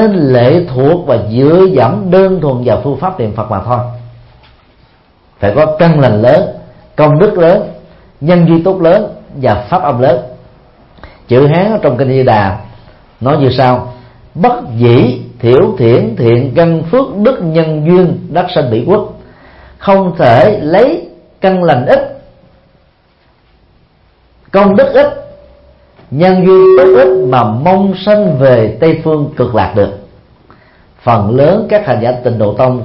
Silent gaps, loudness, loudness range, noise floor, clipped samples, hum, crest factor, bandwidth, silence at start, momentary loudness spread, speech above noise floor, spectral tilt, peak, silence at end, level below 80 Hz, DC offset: none; -9 LUFS; 6 LU; -49 dBFS; 0.2%; none; 10 dB; 5.8 kHz; 0 s; 9 LU; 41 dB; -10 dB/octave; 0 dBFS; 0 s; -38 dBFS; under 0.1%